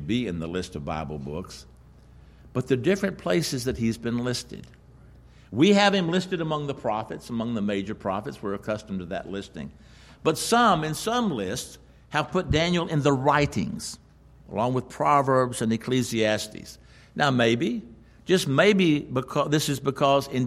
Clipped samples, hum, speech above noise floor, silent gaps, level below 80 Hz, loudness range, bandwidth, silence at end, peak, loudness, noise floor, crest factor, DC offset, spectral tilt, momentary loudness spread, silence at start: under 0.1%; none; 26 dB; none; -50 dBFS; 6 LU; 15 kHz; 0 s; -6 dBFS; -25 LUFS; -51 dBFS; 20 dB; under 0.1%; -5 dB/octave; 15 LU; 0 s